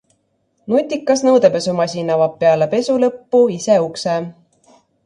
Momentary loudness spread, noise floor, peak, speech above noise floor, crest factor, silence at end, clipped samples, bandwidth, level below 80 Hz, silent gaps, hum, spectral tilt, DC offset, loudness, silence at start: 7 LU; -64 dBFS; 0 dBFS; 49 dB; 16 dB; 0.75 s; under 0.1%; 11 kHz; -62 dBFS; none; none; -5.5 dB/octave; under 0.1%; -16 LUFS; 0.65 s